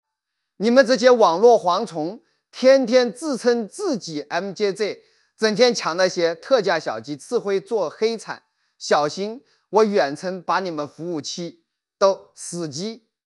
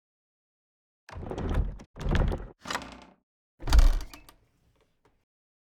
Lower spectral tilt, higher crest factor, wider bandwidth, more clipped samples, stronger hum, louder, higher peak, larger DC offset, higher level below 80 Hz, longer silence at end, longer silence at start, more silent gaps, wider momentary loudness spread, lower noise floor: second, -4 dB/octave vs -5.5 dB/octave; about the same, 20 dB vs 22 dB; second, 11.5 kHz vs 13.5 kHz; neither; neither; first, -20 LUFS vs -31 LUFS; first, 0 dBFS vs -6 dBFS; neither; second, -80 dBFS vs -30 dBFS; second, 0.3 s vs 1.65 s; second, 0.6 s vs 1.1 s; second, none vs 1.86-1.94 s, 3.23-3.58 s; second, 16 LU vs 22 LU; first, -80 dBFS vs -68 dBFS